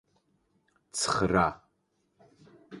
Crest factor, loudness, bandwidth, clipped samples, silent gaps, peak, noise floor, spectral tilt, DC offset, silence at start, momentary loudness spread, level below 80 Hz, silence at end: 24 dB; -28 LUFS; 11.5 kHz; under 0.1%; none; -8 dBFS; -75 dBFS; -4 dB/octave; under 0.1%; 0.95 s; 14 LU; -54 dBFS; 0 s